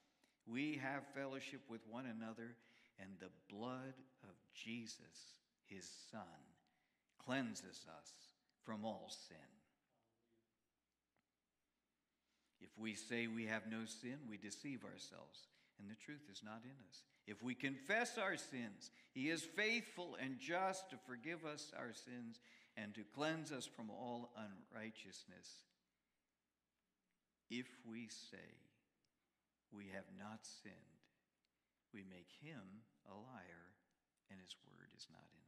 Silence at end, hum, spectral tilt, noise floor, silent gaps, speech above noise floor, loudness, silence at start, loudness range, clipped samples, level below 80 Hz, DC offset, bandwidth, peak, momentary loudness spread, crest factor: 0.05 s; none; -4 dB/octave; under -90 dBFS; none; over 40 dB; -49 LUFS; 0.45 s; 15 LU; under 0.1%; under -90 dBFS; under 0.1%; 14.5 kHz; -26 dBFS; 19 LU; 24 dB